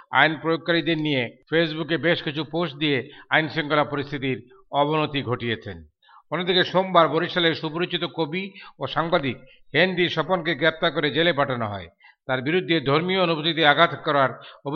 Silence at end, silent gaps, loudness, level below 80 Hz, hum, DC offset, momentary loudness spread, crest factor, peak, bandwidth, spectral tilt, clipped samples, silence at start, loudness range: 0 s; none; -22 LUFS; -58 dBFS; none; under 0.1%; 10 LU; 22 dB; -2 dBFS; 6.4 kHz; -7 dB/octave; under 0.1%; 0.1 s; 3 LU